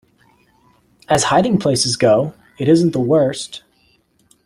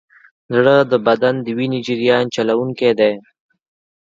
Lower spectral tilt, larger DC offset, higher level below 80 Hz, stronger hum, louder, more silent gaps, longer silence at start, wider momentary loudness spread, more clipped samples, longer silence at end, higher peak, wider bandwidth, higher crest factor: about the same, -5 dB/octave vs -6 dB/octave; neither; first, -52 dBFS vs -64 dBFS; neither; about the same, -16 LUFS vs -16 LUFS; neither; first, 1.1 s vs 0.5 s; first, 13 LU vs 8 LU; neither; about the same, 0.9 s vs 0.85 s; about the same, 0 dBFS vs 0 dBFS; first, 14 kHz vs 7.6 kHz; about the same, 18 dB vs 16 dB